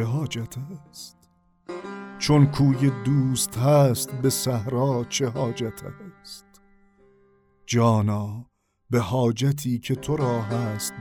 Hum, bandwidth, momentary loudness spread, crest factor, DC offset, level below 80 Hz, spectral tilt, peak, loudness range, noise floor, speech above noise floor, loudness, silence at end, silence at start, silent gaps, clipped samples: none; 19 kHz; 21 LU; 18 dB; under 0.1%; -54 dBFS; -6 dB/octave; -6 dBFS; 7 LU; -60 dBFS; 37 dB; -23 LUFS; 0 s; 0 s; none; under 0.1%